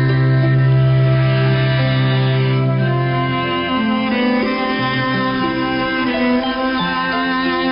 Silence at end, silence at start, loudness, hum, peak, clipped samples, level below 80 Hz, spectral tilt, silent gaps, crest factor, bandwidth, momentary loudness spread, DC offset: 0 s; 0 s; -16 LUFS; none; -8 dBFS; under 0.1%; -42 dBFS; -11.5 dB/octave; none; 8 dB; 5.4 kHz; 4 LU; under 0.1%